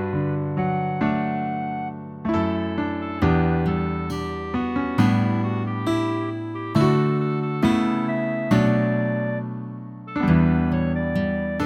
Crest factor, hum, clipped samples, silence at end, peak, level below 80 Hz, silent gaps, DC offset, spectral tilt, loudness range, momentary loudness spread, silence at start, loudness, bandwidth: 16 dB; none; under 0.1%; 0 s; -6 dBFS; -40 dBFS; none; under 0.1%; -8 dB/octave; 3 LU; 10 LU; 0 s; -23 LUFS; 10.5 kHz